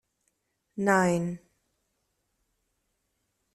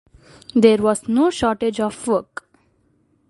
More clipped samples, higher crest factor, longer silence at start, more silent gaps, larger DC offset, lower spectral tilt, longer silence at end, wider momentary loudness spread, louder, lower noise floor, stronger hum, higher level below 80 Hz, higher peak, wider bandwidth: neither; about the same, 22 dB vs 20 dB; first, 0.75 s vs 0.55 s; neither; neither; about the same, -6 dB/octave vs -5 dB/octave; first, 2.15 s vs 1.05 s; first, 20 LU vs 9 LU; second, -26 LUFS vs -18 LUFS; first, -78 dBFS vs -62 dBFS; neither; second, -70 dBFS vs -52 dBFS; second, -10 dBFS vs 0 dBFS; first, 13.5 kHz vs 11.5 kHz